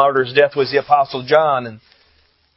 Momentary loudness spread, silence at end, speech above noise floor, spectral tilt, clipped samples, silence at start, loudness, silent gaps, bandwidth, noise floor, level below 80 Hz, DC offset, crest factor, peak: 5 LU; 0.8 s; 42 dB; -7 dB/octave; under 0.1%; 0 s; -16 LUFS; none; 5.8 kHz; -58 dBFS; -62 dBFS; under 0.1%; 16 dB; 0 dBFS